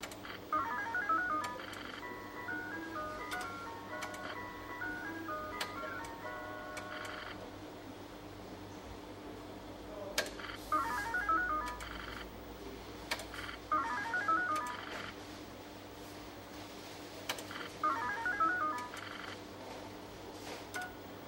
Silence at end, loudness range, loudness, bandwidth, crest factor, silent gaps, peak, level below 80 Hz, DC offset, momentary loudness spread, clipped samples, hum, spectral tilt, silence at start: 0 s; 7 LU; -40 LUFS; 16.5 kHz; 26 dB; none; -14 dBFS; -60 dBFS; under 0.1%; 15 LU; under 0.1%; none; -3 dB/octave; 0 s